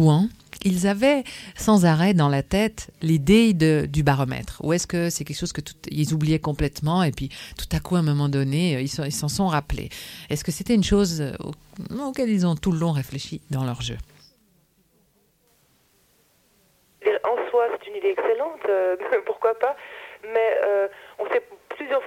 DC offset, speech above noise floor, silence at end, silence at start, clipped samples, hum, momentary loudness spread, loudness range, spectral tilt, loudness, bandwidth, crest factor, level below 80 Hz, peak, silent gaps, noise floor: under 0.1%; 41 dB; 0 s; 0 s; under 0.1%; none; 13 LU; 9 LU; -6 dB/octave; -23 LUFS; 16 kHz; 18 dB; -42 dBFS; -4 dBFS; none; -64 dBFS